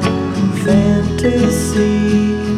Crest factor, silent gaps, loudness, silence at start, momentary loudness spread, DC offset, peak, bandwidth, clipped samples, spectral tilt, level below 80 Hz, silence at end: 10 dB; none; -14 LUFS; 0 s; 4 LU; under 0.1%; -2 dBFS; 14 kHz; under 0.1%; -6.5 dB/octave; -30 dBFS; 0 s